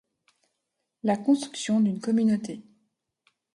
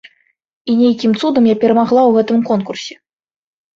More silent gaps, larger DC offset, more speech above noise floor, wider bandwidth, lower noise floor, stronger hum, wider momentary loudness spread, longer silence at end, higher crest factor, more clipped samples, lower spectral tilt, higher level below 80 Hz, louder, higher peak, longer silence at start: neither; neither; first, 56 dB vs 35 dB; first, 11 kHz vs 7.4 kHz; first, -81 dBFS vs -47 dBFS; neither; second, 10 LU vs 14 LU; about the same, 0.95 s vs 0.85 s; about the same, 16 dB vs 14 dB; neither; about the same, -6 dB/octave vs -6.5 dB/octave; second, -72 dBFS vs -60 dBFS; second, -26 LUFS vs -13 LUFS; second, -12 dBFS vs -2 dBFS; first, 1.05 s vs 0.65 s